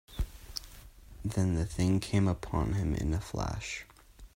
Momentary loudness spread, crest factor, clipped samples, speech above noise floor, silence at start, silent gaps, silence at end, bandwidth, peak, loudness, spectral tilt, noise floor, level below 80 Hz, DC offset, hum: 13 LU; 18 dB; under 0.1%; 21 dB; 0.1 s; none; 0.1 s; 16 kHz; -14 dBFS; -33 LUFS; -6 dB/octave; -51 dBFS; -42 dBFS; under 0.1%; none